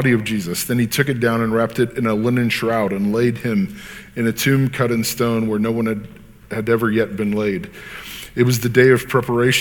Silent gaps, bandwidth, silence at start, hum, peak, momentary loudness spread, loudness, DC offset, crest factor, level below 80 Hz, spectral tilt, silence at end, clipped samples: none; 19 kHz; 0 s; none; 0 dBFS; 12 LU; -18 LUFS; under 0.1%; 18 dB; -48 dBFS; -5.5 dB/octave; 0 s; under 0.1%